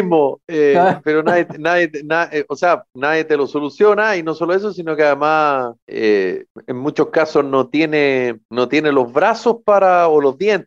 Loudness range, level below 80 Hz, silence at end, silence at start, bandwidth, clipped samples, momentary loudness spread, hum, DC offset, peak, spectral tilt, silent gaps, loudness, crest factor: 2 LU; -66 dBFS; 0.05 s; 0 s; 7.4 kHz; under 0.1%; 8 LU; none; under 0.1%; -4 dBFS; -6 dB/octave; 5.82-5.87 s, 6.50-6.55 s, 8.45-8.49 s; -16 LUFS; 12 dB